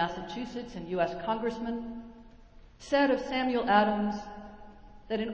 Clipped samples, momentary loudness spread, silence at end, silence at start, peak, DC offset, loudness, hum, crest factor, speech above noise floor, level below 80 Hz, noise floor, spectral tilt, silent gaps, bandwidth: under 0.1%; 20 LU; 0 s; 0 s; -10 dBFS; under 0.1%; -30 LUFS; none; 22 dB; 23 dB; -56 dBFS; -53 dBFS; -6 dB/octave; none; 8 kHz